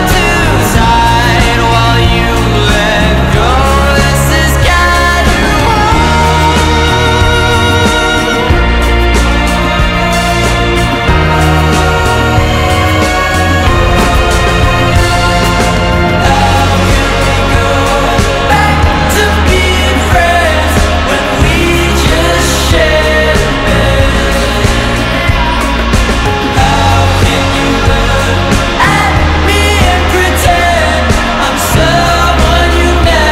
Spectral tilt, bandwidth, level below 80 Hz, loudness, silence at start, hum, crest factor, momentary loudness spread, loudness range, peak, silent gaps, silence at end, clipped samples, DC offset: -4.5 dB/octave; 16.5 kHz; -14 dBFS; -8 LUFS; 0 s; none; 8 dB; 2 LU; 1 LU; 0 dBFS; none; 0 s; under 0.1%; under 0.1%